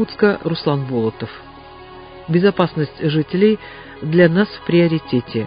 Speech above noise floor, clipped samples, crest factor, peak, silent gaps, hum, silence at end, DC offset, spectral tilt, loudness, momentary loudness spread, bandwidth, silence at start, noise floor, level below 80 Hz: 21 dB; under 0.1%; 18 dB; 0 dBFS; none; none; 0 s; under 0.1%; -10.5 dB/octave; -17 LUFS; 21 LU; 5.2 kHz; 0 s; -38 dBFS; -50 dBFS